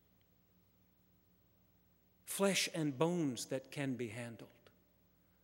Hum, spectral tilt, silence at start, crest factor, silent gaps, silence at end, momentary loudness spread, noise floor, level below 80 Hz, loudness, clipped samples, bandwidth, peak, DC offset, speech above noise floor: 60 Hz at -65 dBFS; -4 dB/octave; 2.25 s; 24 dB; none; 0.95 s; 15 LU; -72 dBFS; -82 dBFS; -38 LUFS; under 0.1%; 16 kHz; -18 dBFS; under 0.1%; 34 dB